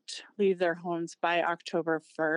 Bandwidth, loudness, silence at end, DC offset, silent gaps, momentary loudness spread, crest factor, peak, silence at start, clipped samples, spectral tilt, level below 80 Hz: 10.5 kHz; -30 LUFS; 0 s; under 0.1%; none; 7 LU; 16 dB; -16 dBFS; 0.1 s; under 0.1%; -5 dB/octave; under -90 dBFS